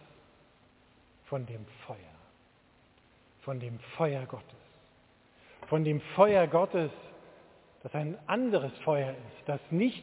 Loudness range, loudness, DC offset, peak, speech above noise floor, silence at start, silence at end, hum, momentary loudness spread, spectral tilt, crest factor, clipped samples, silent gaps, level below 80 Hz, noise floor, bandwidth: 15 LU; -31 LUFS; under 0.1%; -10 dBFS; 33 dB; 1.3 s; 0 s; none; 22 LU; -6 dB/octave; 24 dB; under 0.1%; none; -70 dBFS; -64 dBFS; 4 kHz